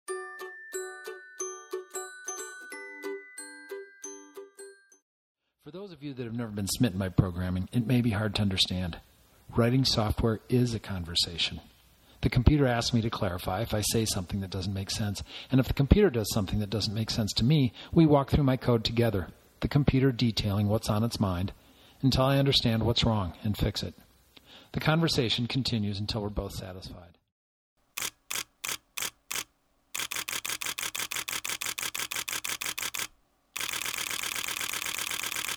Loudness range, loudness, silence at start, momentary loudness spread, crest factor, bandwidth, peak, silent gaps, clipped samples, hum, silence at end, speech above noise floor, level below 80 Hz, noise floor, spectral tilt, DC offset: 13 LU; -29 LUFS; 0.1 s; 16 LU; 24 dB; over 20 kHz; -6 dBFS; 5.02-5.35 s, 27.32-27.76 s; under 0.1%; none; 0 s; 42 dB; -44 dBFS; -69 dBFS; -4.5 dB/octave; under 0.1%